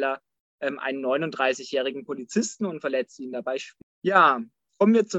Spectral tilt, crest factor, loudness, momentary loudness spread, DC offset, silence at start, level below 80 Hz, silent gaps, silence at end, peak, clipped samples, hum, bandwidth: -4.5 dB/octave; 20 dB; -25 LUFS; 14 LU; under 0.1%; 0 s; -76 dBFS; 0.40-0.58 s, 3.83-4.02 s; 0 s; -6 dBFS; under 0.1%; none; 8.4 kHz